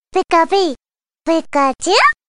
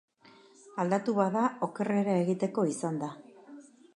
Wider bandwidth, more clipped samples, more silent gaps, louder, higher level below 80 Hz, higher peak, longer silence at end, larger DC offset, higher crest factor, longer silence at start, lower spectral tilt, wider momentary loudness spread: about the same, 11.5 kHz vs 11 kHz; neither; neither; first, -15 LUFS vs -30 LUFS; first, -52 dBFS vs -80 dBFS; first, 0 dBFS vs -12 dBFS; second, 0.15 s vs 0.35 s; neither; about the same, 14 dB vs 18 dB; second, 0.15 s vs 0.65 s; second, -1.5 dB/octave vs -7 dB/octave; second, 11 LU vs 16 LU